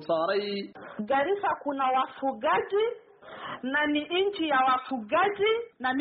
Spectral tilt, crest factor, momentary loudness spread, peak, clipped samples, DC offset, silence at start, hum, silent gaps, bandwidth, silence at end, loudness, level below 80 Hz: -1.5 dB/octave; 14 dB; 12 LU; -14 dBFS; under 0.1%; under 0.1%; 0 s; none; none; 4.8 kHz; 0 s; -27 LUFS; -70 dBFS